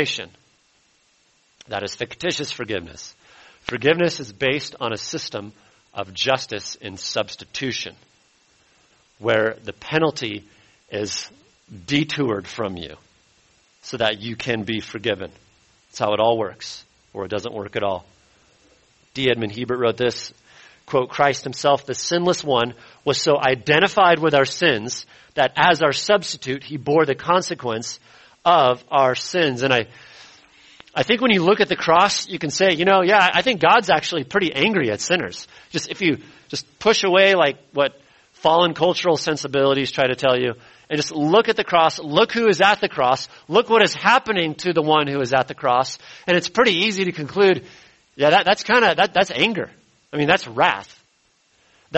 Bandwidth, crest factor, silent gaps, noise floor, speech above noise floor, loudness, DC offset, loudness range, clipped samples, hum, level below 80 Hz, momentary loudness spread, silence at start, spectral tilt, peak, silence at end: 8.4 kHz; 20 dB; none; -62 dBFS; 42 dB; -19 LUFS; under 0.1%; 9 LU; under 0.1%; none; -58 dBFS; 14 LU; 0 s; -4 dB/octave; 0 dBFS; 0 s